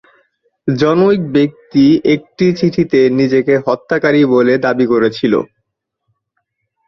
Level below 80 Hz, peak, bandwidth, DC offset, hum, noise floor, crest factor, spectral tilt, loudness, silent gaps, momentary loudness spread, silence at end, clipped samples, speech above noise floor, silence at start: -52 dBFS; -2 dBFS; 6.6 kHz; under 0.1%; none; -71 dBFS; 12 dB; -7.5 dB/octave; -13 LUFS; none; 5 LU; 1.4 s; under 0.1%; 59 dB; 0.65 s